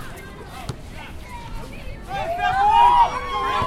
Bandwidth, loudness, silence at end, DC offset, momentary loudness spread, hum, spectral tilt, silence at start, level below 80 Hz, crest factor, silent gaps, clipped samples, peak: 15 kHz; -18 LUFS; 0 s; under 0.1%; 22 LU; none; -4.5 dB/octave; 0 s; -36 dBFS; 18 dB; none; under 0.1%; -4 dBFS